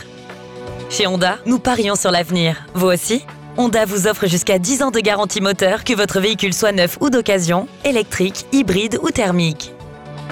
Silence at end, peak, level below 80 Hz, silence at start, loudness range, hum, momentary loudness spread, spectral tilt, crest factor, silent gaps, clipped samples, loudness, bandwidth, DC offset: 0 s; -6 dBFS; -46 dBFS; 0 s; 2 LU; none; 13 LU; -4 dB/octave; 12 dB; none; under 0.1%; -16 LUFS; 18 kHz; under 0.1%